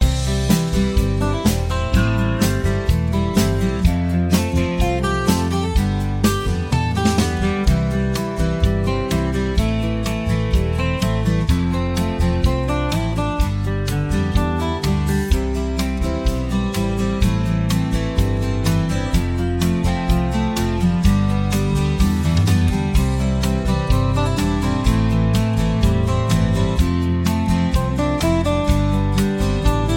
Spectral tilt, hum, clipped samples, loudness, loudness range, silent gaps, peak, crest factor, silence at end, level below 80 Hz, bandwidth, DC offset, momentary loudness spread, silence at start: -6.5 dB/octave; none; under 0.1%; -19 LUFS; 2 LU; none; -2 dBFS; 16 dB; 0 s; -24 dBFS; 17.5 kHz; under 0.1%; 3 LU; 0 s